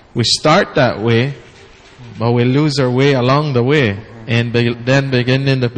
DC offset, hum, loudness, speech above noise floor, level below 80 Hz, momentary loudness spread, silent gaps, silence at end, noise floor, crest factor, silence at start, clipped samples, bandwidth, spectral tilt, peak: under 0.1%; none; -14 LUFS; 28 dB; -46 dBFS; 7 LU; none; 0 s; -41 dBFS; 14 dB; 0.15 s; under 0.1%; 9.8 kHz; -6 dB/octave; 0 dBFS